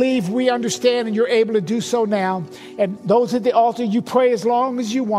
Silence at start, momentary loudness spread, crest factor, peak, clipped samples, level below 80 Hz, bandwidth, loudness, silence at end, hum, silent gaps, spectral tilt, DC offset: 0 s; 6 LU; 16 dB; -2 dBFS; under 0.1%; -66 dBFS; 14.5 kHz; -19 LUFS; 0 s; none; none; -5 dB/octave; under 0.1%